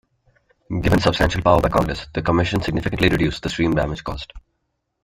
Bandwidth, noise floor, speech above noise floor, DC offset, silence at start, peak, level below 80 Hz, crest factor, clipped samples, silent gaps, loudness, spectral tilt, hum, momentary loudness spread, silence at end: 16 kHz; -74 dBFS; 54 dB; under 0.1%; 0.7 s; -2 dBFS; -34 dBFS; 20 dB; under 0.1%; none; -20 LUFS; -6 dB/octave; none; 12 LU; 0.65 s